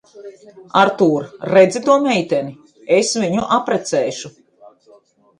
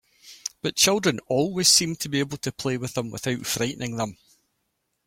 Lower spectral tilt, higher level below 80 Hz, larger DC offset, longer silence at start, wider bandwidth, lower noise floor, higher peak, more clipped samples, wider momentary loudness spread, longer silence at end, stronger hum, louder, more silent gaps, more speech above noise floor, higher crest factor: first, -4.5 dB/octave vs -3 dB/octave; about the same, -60 dBFS vs -60 dBFS; neither; about the same, 0.15 s vs 0.25 s; second, 11 kHz vs 16.5 kHz; second, -51 dBFS vs -76 dBFS; first, 0 dBFS vs -4 dBFS; neither; about the same, 12 LU vs 13 LU; first, 1.1 s vs 0.9 s; neither; first, -16 LUFS vs -23 LUFS; neither; second, 34 dB vs 51 dB; about the same, 18 dB vs 22 dB